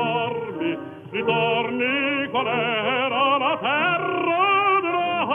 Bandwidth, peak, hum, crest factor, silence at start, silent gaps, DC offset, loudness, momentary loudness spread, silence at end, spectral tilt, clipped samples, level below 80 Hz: 4.1 kHz; -8 dBFS; none; 16 dB; 0 s; none; under 0.1%; -21 LUFS; 8 LU; 0 s; -7 dB/octave; under 0.1%; -76 dBFS